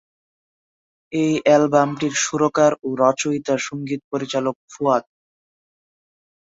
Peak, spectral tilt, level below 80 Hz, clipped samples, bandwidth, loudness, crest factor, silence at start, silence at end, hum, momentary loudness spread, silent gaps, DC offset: -2 dBFS; -4.5 dB/octave; -64 dBFS; under 0.1%; 8 kHz; -20 LUFS; 18 dB; 1.1 s; 1.45 s; none; 10 LU; 4.04-4.11 s, 4.55-4.68 s; under 0.1%